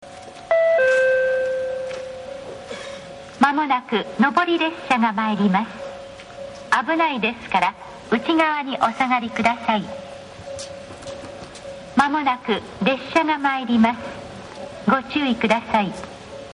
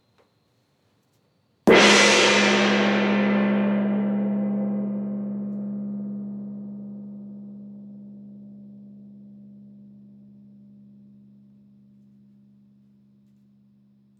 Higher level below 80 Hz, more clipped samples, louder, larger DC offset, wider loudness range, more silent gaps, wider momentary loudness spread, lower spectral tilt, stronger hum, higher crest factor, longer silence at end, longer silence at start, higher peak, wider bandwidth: first, -56 dBFS vs -64 dBFS; neither; about the same, -20 LUFS vs -20 LUFS; neither; second, 4 LU vs 23 LU; neither; second, 18 LU vs 28 LU; about the same, -5 dB/octave vs -4 dB/octave; neither; about the same, 18 dB vs 22 dB; second, 0 s vs 4.55 s; second, 0 s vs 1.65 s; about the same, -4 dBFS vs -4 dBFS; second, 10.5 kHz vs 12 kHz